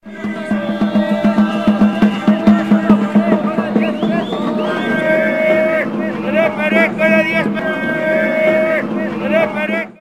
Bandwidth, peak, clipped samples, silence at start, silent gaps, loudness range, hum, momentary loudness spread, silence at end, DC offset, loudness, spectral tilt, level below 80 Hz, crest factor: 9.6 kHz; 0 dBFS; under 0.1%; 0.05 s; none; 2 LU; none; 7 LU; 0.1 s; 0.3%; -15 LUFS; -7.5 dB/octave; -48 dBFS; 14 dB